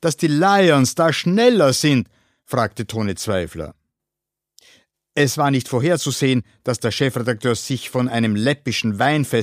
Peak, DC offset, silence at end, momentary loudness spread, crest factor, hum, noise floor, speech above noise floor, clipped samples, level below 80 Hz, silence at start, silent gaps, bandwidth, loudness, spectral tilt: -2 dBFS; under 0.1%; 0 s; 10 LU; 16 dB; none; -85 dBFS; 66 dB; under 0.1%; -54 dBFS; 0 s; none; 15.5 kHz; -18 LUFS; -5 dB/octave